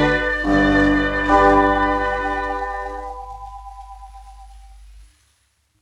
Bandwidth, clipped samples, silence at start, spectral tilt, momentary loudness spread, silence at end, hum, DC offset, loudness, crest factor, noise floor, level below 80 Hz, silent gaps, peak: 10.5 kHz; under 0.1%; 0 s; -6.5 dB/octave; 23 LU; 0.8 s; none; under 0.1%; -17 LUFS; 16 dB; -64 dBFS; -34 dBFS; none; -4 dBFS